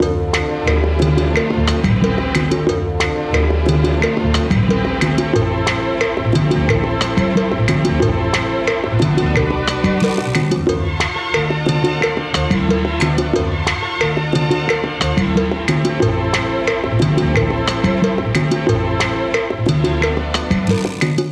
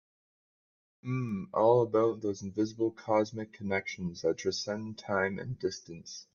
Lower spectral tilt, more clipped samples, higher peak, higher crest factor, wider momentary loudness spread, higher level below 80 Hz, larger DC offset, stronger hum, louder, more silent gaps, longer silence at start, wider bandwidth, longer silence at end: about the same, -6 dB/octave vs -5.5 dB/octave; neither; first, -2 dBFS vs -12 dBFS; second, 14 dB vs 20 dB; second, 3 LU vs 13 LU; first, -26 dBFS vs -70 dBFS; neither; neither; first, -17 LUFS vs -32 LUFS; neither; second, 0 s vs 1.05 s; first, 11 kHz vs 7.2 kHz; about the same, 0 s vs 0.1 s